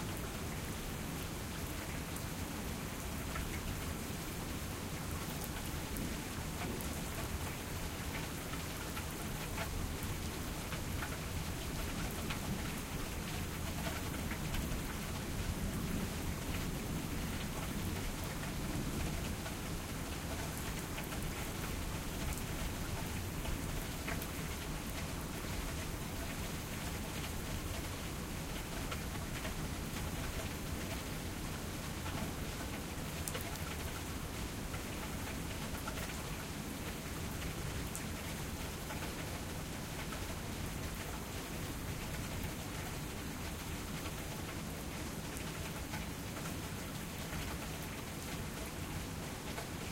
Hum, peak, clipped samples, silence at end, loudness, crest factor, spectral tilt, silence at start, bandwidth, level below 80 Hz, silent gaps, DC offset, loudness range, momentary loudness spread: none; -16 dBFS; under 0.1%; 0 s; -41 LUFS; 24 dB; -4 dB/octave; 0 s; 16.5 kHz; -48 dBFS; none; under 0.1%; 2 LU; 3 LU